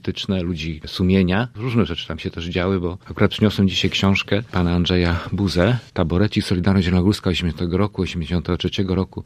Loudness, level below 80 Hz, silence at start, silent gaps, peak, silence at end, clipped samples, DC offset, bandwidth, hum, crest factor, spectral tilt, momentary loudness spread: -20 LUFS; -38 dBFS; 0.05 s; none; 0 dBFS; 0.05 s; under 0.1%; under 0.1%; 13 kHz; none; 20 dB; -6.5 dB/octave; 7 LU